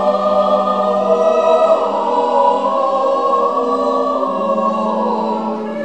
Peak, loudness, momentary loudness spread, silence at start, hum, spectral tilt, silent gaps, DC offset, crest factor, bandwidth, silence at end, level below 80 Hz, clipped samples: -2 dBFS; -15 LUFS; 5 LU; 0 s; none; -6.5 dB/octave; none; 0.4%; 14 dB; 8.8 kHz; 0 s; -64 dBFS; under 0.1%